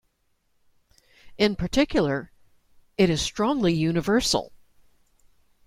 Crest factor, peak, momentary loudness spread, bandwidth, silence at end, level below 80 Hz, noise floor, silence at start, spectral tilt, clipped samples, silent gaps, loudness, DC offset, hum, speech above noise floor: 20 dB; -6 dBFS; 6 LU; 16 kHz; 1.2 s; -46 dBFS; -70 dBFS; 1.25 s; -5 dB/octave; under 0.1%; none; -24 LUFS; under 0.1%; none; 47 dB